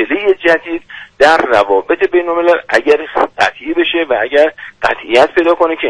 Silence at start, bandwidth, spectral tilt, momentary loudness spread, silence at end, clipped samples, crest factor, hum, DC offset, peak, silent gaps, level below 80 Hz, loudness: 0 s; 11 kHz; -4 dB/octave; 7 LU; 0 s; 0.1%; 12 dB; none; under 0.1%; 0 dBFS; none; -46 dBFS; -12 LUFS